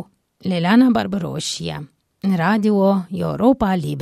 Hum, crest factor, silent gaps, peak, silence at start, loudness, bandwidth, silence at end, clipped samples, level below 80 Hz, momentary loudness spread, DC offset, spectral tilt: none; 16 dB; none; -4 dBFS; 0 s; -18 LUFS; 14 kHz; 0 s; under 0.1%; -46 dBFS; 12 LU; under 0.1%; -6 dB/octave